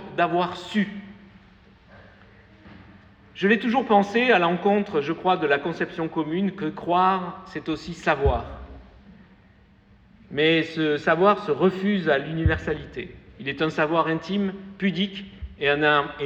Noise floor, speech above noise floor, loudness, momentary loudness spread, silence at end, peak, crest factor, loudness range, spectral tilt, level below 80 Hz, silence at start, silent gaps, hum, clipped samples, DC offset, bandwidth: -55 dBFS; 32 dB; -23 LUFS; 13 LU; 0 s; -6 dBFS; 18 dB; 6 LU; -6.5 dB/octave; -42 dBFS; 0 s; none; none; under 0.1%; under 0.1%; 8.2 kHz